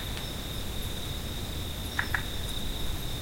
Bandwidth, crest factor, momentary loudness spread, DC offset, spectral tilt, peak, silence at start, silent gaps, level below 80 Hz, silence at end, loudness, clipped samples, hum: 16.5 kHz; 22 dB; 4 LU; 0.1%; -3.5 dB/octave; -12 dBFS; 0 s; none; -38 dBFS; 0 s; -34 LUFS; under 0.1%; none